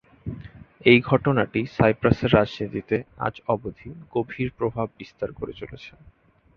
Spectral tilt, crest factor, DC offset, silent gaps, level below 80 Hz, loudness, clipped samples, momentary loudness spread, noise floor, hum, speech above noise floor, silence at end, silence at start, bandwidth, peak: -8.5 dB/octave; 22 dB; under 0.1%; none; -48 dBFS; -23 LUFS; under 0.1%; 19 LU; -43 dBFS; none; 20 dB; 0.7 s; 0.25 s; 6.6 kHz; -2 dBFS